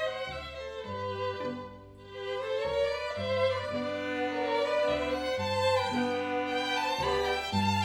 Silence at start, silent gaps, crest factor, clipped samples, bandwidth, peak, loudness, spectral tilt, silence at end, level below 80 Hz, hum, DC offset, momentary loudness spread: 0 s; none; 14 dB; under 0.1%; 18.5 kHz; -16 dBFS; -31 LUFS; -5 dB/octave; 0 s; -56 dBFS; none; under 0.1%; 10 LU